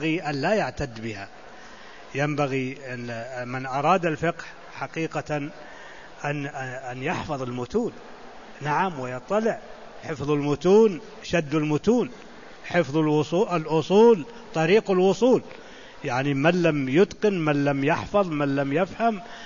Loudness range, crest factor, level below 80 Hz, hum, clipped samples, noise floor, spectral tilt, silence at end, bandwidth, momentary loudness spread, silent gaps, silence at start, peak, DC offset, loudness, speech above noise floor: 9 LU; 18 dB; -54 dBFS; none; under 0.1%; -45 dBFS; -6.5 dB/octave; 0 s; 7.4 kHz; 22 LU; none; 0 s; -6 dBFS; 0.4%; -24 LUFS; 21 dB